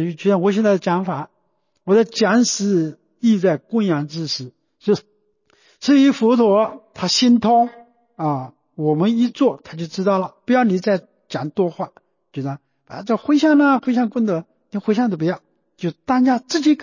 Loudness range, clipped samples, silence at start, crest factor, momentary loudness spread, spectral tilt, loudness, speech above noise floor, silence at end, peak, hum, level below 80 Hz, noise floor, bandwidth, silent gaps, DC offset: 4 LU; under 0.1%; 0 s; 14 dB; 15 LU; -5.5 dB/octave; -18 LUFS; 51 dB; 0 s; -6 dBFS; none; -64 dBFS; -68 dBFS; 7.4 kHz; none; under 0.1%